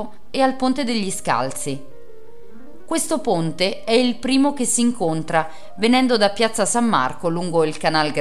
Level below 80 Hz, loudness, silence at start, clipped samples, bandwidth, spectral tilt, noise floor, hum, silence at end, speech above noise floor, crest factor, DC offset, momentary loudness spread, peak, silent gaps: -54 dBFS; -20 LUFS; 0 s; under 0.1%; 14 kHz; -3.5 dB/octave; -45 dBFS; none; 0 s; 25 dB; 16 dB; 3%; 7 LU; -2 dBFS; none